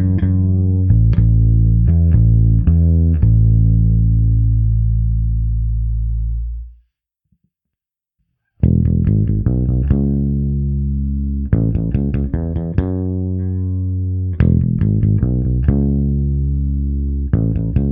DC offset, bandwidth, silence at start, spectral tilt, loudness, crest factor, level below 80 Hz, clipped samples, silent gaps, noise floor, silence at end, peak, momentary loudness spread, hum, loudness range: under 0.1%; 2.8 kHz; 0 s; -14 dB/octave; -16 LUFS; 14 dB; -20 dBFS; under 0.1%; none; -84 dBFS; 0 s; 0 dBFS; 7 LU; none; 8 LU